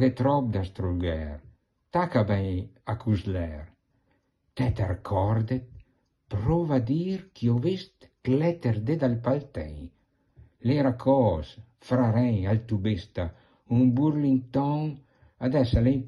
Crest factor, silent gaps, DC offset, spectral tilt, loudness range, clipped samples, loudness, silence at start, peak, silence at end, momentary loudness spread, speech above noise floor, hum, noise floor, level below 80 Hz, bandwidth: 16 dB; none; under 0.1%; -9.5 dB/octave; 4 LU; under 0.1%; -27 LUFS; 0 s; -10 dBFS; 0 s; 13 LU; 45 dB; none; -71 dBFS; -46 dBFS; 6.8 kHz